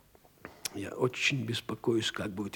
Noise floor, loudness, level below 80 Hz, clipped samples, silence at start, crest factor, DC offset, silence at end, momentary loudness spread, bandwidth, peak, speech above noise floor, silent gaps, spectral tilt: -53 dBFS; -32 LUFS; -68 dBFS; under 0.1%; 0.45 s; 20 dB; under 0.1%; 0 s; 12 LU; 19.5 kHz; -14 dBFS; 21 dB; none; -4 dB/octave